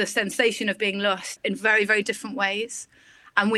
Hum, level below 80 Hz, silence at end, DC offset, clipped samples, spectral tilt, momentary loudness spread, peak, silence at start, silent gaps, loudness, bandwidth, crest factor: none; -72 dBFS; 0 s; under 0.1%; under 0.1%; -3 dB/octave; 9 LU; -4 dBFS; 0 s; none; -23 LUFS; 16 kHz; 20 dB